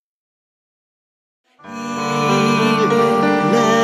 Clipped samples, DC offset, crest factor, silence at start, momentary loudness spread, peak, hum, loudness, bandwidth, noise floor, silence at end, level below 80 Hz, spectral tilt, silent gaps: under 0.1%; under 0.1%; 16 dB; 1.65 s; 12 LU; -2 dBFS; none; -16 LUFS; 14.5 kHz; under -90 dBFS; 0 s; -60 dBFS; -5 dB/octave; none